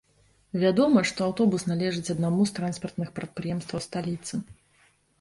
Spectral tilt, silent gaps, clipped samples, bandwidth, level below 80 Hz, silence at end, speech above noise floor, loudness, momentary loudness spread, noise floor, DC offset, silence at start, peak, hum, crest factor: -6 dB/octave; none; under 0.1%; 11.5 kHz; -60 dBFS; 0.7 s; 38 dB; -27 LUFS; 12 LU; -64 dBFS; under 0.1%; 0.55 s; -8 dBFS; none; 20 dB